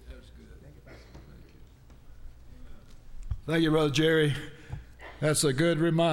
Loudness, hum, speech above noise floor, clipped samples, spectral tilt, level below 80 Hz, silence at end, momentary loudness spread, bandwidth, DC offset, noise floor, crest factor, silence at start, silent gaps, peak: -26 LUFS; none; 27 dB; under 0.1%; -5 dB/octave; -46 dBFS; 0 s; 24 LU; 17 kHz; under 0.1%; -52 dBFS; 16 dB; 0.05 s; none; -14 dBFS